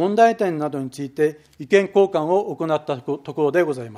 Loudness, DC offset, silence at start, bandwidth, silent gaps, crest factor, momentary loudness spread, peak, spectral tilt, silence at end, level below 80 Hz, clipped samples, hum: -21 LUFS; under 0.1%; 0 s; 12.5 kHz; none; 18 dB; 11 LU; -2 dBFS; -6.5 dB/octave; 0 s; -68 dBFS; under 0.1%; none